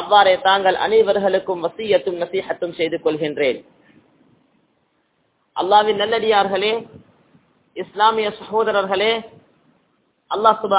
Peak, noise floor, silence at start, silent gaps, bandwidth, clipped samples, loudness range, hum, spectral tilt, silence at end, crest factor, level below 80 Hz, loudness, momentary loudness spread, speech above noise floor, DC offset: 0 dBFS; -66 dBFS; 0 s; none; 4 kHz; under 0.1%; 5 LU; none; -8 dB/octave; 0 s; 20 dB; -60 dBFS; -18 LUFS; 11 LU; 48 dB; under 0.1%